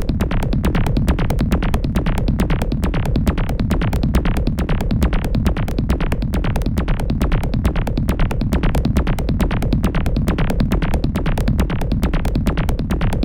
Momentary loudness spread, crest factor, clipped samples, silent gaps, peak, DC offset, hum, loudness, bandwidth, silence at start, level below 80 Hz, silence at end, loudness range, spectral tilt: 2 LU; 16 dB; under 0.1%; none; -2 dBFS; under 0.1%; none; -20 LUFS; 17 kHz; 0 s; -20 dBFS; 0 s; 1 LU; -7 dB/octave